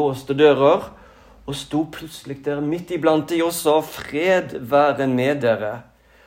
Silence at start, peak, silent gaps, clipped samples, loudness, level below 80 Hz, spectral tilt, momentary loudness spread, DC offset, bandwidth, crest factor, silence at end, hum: 0 s; -2 dBFS; none; under 0.1%; -20 LUFS; -54 dBFS; -5.5 dB/octave; 15 LU; under 0.1%; 16 kHz; 18 dB; 0.45 s; none